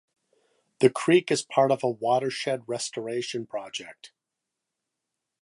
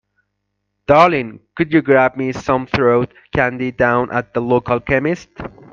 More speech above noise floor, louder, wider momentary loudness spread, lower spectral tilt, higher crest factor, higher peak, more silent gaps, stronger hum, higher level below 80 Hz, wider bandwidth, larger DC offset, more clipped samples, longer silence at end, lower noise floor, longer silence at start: about the same, 60 dB vs 57 dB; second, -26 LUFS vs -16 LUFS; about the same, 12 LU vs 11 LU; second, -4.5 dB/octave vs -7 dB/octave; first, 22 dB vs 16 dB; second, -4 dBFS vs 0 dBFS; neither; second, none vs 50 Hz at -50 dBFS; second, -76 dBFS vs -44 dBFS; first, 11.5 kHz vs 7.4 kHz; neither; neither; first, 1.35 s vs 0.25 s; first, -85 dBFS vs -73 dBFS; about the same, 0.8 s vs 0.9 s